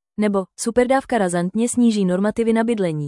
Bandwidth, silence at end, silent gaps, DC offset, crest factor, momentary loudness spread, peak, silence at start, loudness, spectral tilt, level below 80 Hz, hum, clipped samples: 12 kHz; 0 s; none; under 0.1%; 16 dB; 4 LU; -4 dBFS; 0.2 s; -19 LUFS; -5.5 dB/octave; -52 dBFS; none; under 0.1%